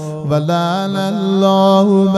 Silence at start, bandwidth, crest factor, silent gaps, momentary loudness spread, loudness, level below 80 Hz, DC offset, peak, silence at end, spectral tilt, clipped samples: 0 s; 12.5 kHz; 12 dB; none; 7 LU; -14 LUFS; -56 dBFS; under 0.1%; -2 dBFS; 0 s; -7 dB/octave; under 0.1%